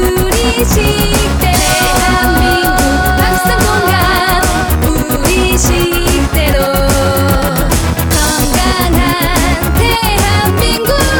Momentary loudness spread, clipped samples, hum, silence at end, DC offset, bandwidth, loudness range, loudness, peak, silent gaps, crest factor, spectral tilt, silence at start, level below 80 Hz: 2 LU; under 0.1%; none; 0 s; 0.2%; 19.5 kHz; 1 LU; -11 LUFS; 0 dBFS; none; 10 dB; -4 dB/octave; 0 s; -16 dBFS